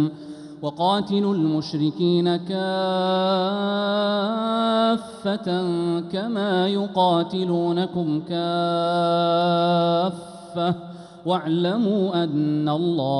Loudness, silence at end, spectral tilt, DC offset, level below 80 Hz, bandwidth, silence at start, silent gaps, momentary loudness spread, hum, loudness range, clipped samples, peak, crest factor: -22 LUFS; 0 s; -7.5 dB/octave; under 0.1%; -66 dBFS; 11 kHz; 0 s; none; 7 LU; none; 1 LU; under 0.1%; -8 dBFS; 14 dB